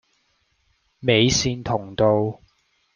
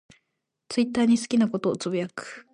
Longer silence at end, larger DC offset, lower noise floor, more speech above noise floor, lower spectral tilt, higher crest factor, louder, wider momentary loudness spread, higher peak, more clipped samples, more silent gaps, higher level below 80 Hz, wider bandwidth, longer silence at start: first, 0.6 s vs 0.15 s; neither; second, -67 dBFS vs -80 dBFS; second, 47 dB vs 55 dB; about the same, -4.5 dB/octave vs -5.5 dB/octave; first, 22 dB vs 14 dB; first, -21 LUFS vs -25 LUFS; about the same, 10 LU vs 10 LU; first, -2 dBFS vs -12 dBFS; neither; neither; first, -48 dBFS vs -66 dBFS; about the same, 10.5 kHz vs 11 kHz; first, 1 s vs 0.7 s